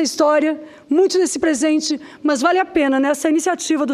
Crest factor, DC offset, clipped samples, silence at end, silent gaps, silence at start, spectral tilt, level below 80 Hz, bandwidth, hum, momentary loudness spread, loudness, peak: 16 dB; under 0.1%; under 0.1%; 0 s; none; 0 s; -2 dB/octave; -58 dBFS; 14.5 kHz; none; 6 LU; -17 LUFS; -2 dBFS